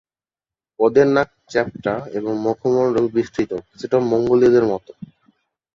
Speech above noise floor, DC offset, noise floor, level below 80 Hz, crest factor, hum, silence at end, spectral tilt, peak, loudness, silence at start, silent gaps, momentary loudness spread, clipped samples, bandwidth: over 72 dB; under 0.1%; under -90 dBFS; -54 dBFS; 18 dB; none; 0.7 s; -7 dB/octave; -2 dBFS; -19 LUFS; 0.8 s; none; 10 LU; under 0.1%; 7.4 kHz